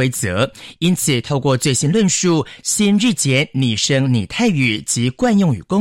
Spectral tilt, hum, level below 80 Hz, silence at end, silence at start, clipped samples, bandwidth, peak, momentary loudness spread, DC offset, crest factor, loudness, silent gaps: -4.5 dB/octave; none; -48 dBFS; 0 s; 0 s; under 0.1%; 16.5 kHz; -4 dBFS; 4 LU; under 0.1%; 12 dB; -16 LUFS; none